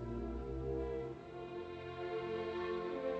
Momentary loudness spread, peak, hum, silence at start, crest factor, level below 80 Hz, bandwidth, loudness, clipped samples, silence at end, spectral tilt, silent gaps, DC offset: 7 LU; -28 dBFS; none; 0 s; 14 dB; -52 dBFS; 8 kHz; -43 LUFS; under 0.1%; 0 s; -8 dB/octave; none; under 0.1%